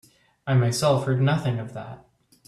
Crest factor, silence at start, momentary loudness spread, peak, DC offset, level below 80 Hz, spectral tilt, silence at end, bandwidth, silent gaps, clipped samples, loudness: 16 dB; 0.45 s; 17 LU; -8 dBFS; under 0.1%; -60 dBFS; -6 dB/octave; 0.5 s; 13 kHz; none; under 0.1%; -23 LUFS